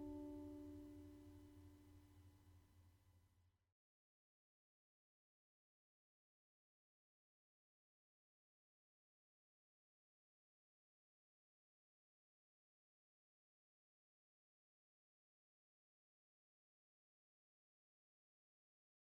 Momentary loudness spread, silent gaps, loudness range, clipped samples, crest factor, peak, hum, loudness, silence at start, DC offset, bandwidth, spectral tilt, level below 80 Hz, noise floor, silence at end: 14 LU; none; 9 LU; under 0.1%; 22 dB; -44 dBFS; none; -59 LUFS; 0 s; under 0.1%; 17 kHz; -7.5 dB/octave; -82 dBFS; -80 dBFS; 15.6 s